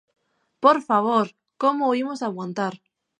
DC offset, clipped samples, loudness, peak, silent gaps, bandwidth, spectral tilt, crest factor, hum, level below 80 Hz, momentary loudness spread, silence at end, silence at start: under 0.1%; under 0.1%; -22 LUFS; -2 dBFS; none; 10.5 kHz; -6 dB/octave; 22 dB; none; -80 dBFS; 10 LU; 0.45 s; 0.6 s